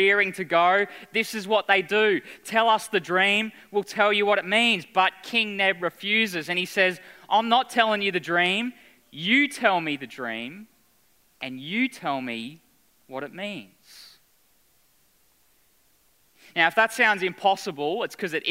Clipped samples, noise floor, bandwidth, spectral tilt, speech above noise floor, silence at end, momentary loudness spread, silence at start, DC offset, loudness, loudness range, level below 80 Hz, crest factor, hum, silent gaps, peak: under 0.1%; -64 dBFS; 16 kHz; -3.5 dB/octave; 40 dB; 0 s; 14 LU; 0 s; under 0.1%; -23 LUFS; 14 LU; -76 dBFS; 22 dB; none; none; -4 dBFS